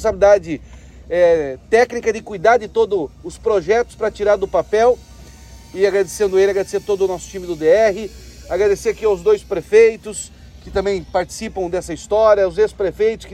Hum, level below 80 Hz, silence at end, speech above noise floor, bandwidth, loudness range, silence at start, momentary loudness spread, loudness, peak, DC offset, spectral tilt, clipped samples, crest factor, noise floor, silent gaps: none; -40 dBFS; 0 s; 23 dB; 14 kHz; 2 LU; 0 s; 12 LU; -17 LUFS; -2 dBFS; under 0.1%; -4.5 dB/octave; under 0.1%; 16 dB; -39 dBFS; none